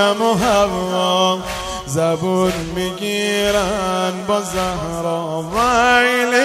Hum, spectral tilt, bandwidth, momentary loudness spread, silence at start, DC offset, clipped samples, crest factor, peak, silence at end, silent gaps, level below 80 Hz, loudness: none; -4 dB/octave; 16 kHz; 9 LU; 0 s; under 0.1%; under 0.1%; 16 dB; -2 dBFS; 0 s; none; -40 dBFS; -17 LUFS